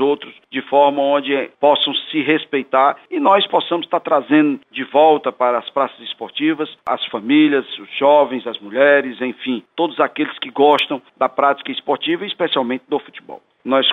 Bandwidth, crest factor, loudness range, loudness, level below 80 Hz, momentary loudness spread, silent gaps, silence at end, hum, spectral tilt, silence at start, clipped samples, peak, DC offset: 4.7 kHz; 16 dB; 3 LU; -17 LUFS; -72 dBFS; 11 LU; none; 0 s; none; -6 dB/octave; 0 s; under 0.1%; -2 dBFS; under 0.1%